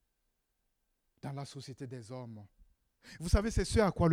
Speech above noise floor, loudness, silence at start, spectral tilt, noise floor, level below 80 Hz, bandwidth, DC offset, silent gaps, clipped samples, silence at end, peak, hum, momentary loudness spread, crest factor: 48 dB; -34 LUFS; 1.25 s; -6 dB/octave; -81 dBFS; -44 dBFS; 15.5 kHz; under 0.1%; none; under 0.1%; 0 s; -14 dBFS; none; 19 LU; 22 dB